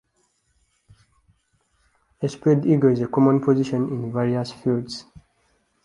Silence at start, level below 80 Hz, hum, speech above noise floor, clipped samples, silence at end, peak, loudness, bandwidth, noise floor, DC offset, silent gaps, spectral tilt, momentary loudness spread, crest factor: 2.2 s; -60 dBFS; none; 48 dB; under 0.1%; 0.85 s; -4 dBFS; -21 LUFS; 11 kHz; -68 dBFS; under 0.1%; none; -8 dB/octave; 12 LU; 20 dB